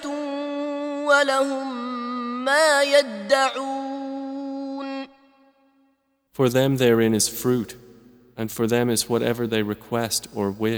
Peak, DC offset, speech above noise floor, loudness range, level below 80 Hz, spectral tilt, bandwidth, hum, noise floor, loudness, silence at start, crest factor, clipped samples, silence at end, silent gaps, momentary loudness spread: -6 dBFS; under 0.1%; 46 dB; 7 LU; -60 dBFS; -4 dB/octave; over 20 kHz; none; -67 dBFS; -22 LUFS; 0 s; 18 dB; under 0.1%; 0 s; none; 13 LU